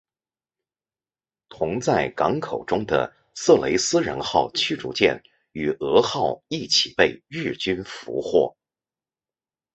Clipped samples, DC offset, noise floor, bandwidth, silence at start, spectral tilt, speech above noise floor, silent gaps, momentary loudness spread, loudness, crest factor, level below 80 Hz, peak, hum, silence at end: under 0.1%; under 0.1%; under -90 dBFS; 8.2 kHz; 1.5 s; -3.5 dB/octave; over 68 dB; none; 11 LU; -22 LUFS; 22 dB; -54 dBFS; -2 dBFS; none; 1.25 s